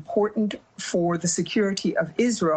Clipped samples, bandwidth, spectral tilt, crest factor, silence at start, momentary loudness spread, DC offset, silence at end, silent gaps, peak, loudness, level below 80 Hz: under 0.1%; 9.4 kHz; -4.5 dB/octave; 14 dB; 0 s; 5 LU; under 0.1%; 0 s; none; -10 dBFS; -25 LUFS; -62 dBFS